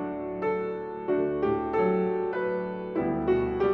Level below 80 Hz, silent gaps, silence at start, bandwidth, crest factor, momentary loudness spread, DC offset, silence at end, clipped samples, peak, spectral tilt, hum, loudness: -52 dBFS; none; 0 s; 5.6 kHz; 14 dB; 6 LU; under 0.1%; 0 s; under 0.1%; -14 dBFS; -10 dB/octave; none; -28 LUFS